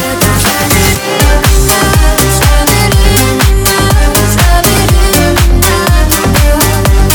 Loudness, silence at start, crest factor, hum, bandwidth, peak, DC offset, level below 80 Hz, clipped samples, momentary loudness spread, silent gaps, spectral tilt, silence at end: -8 LUFS; 0 s; 6 dB; none; over 20 kHz; 0 dBFS; under 0.1%; -10 dBFS; 0.5%; 1 LU; none; -4 dB/octave; 0 s